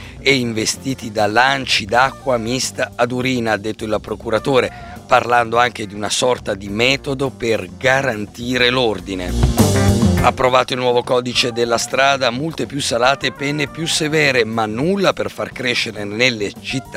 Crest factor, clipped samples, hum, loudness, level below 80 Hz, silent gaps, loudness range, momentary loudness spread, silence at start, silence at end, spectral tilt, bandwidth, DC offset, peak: 16 dB; under 0.1%; none; -17 LUFS; -34 dBFS; none; 2 LU; 9 LU; 0 s; 0 s; -4 dB/octave; 16 kHz; under 0.1%; 0 dBFS